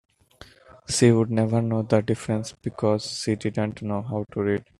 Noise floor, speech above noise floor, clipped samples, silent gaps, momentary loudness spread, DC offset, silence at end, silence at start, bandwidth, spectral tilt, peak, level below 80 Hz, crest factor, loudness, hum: -51 dBFS; 27 dB; under 0.1%; none; 10 LU; under 0.1%; 0.2 s; 0.9 s; 12 kHz; -6 dB/octave; -4 dBFS; -56 dBFS; 20 dB; -24 LUFS; none